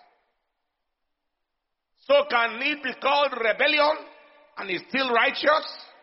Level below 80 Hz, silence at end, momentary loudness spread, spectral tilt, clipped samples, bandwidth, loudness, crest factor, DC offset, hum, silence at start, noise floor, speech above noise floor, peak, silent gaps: -70 dBFS; 0.2 s; 11 LU; 1 dB/octave; under 0.1%; 6 kHz; -23 LUFS; 18 dB; under 0.1%; none; 2.1 s; -81 dBFS; 57 dB; -8 dBFS; none